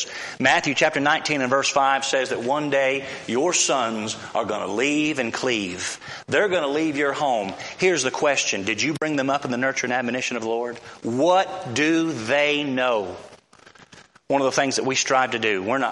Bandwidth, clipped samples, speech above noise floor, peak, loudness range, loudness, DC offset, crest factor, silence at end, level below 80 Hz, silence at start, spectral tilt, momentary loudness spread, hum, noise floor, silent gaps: 11.5 kHz; under 0.1%; 28 dB; -4 dBFS; 3 LU; -22 LUFS; under 0.1%; 18 dB; 0 s; -66 dBFS; 0 s; -3 dB/octave; 8 LU; none; -50 dBFS; none